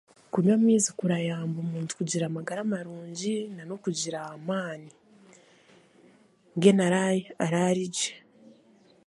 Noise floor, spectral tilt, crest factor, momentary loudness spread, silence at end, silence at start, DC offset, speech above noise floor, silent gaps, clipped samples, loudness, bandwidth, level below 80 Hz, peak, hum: -60 dBFS; -5 dB/octave; 22 dB; 13 LU; 0.9 s; 0.35 s; under 0.1%; 33 dB; none; under 0.1%; -27 LUFS; 11.5 kHz; -74 dBFS; -6 dBFS; none